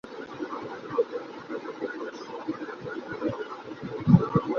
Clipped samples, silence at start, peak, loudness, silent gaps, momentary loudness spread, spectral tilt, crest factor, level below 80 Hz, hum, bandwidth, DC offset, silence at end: under 0.1%; 0.05 s; -4 dBFS; -30 LUFS; none; 16 LU; -9 dB/octave; 24 dB; -56 dBFS; none; 6.8 kHz; under 0.1%; 0 s